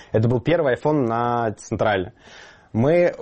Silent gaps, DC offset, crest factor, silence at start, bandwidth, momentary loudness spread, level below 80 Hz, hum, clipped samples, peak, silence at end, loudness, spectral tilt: none; under 0.1%; 14 dB; 0 s; 8.4 kHz; 7 LU; -48 dBFS; none; under 0.1%; -8 dBFS; 0 s; -21 LUFS; -7.5 dB/octave